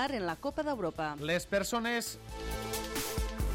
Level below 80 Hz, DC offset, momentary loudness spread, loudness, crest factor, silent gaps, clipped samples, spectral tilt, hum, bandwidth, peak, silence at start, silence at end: -44 dBFS; under 0.1%; 7 LU; -35 LUFS; 16 dB; none; under 0.1%; -4 dB/octave; none; 17 kHz; -20 dBFS; 0 s; 0 s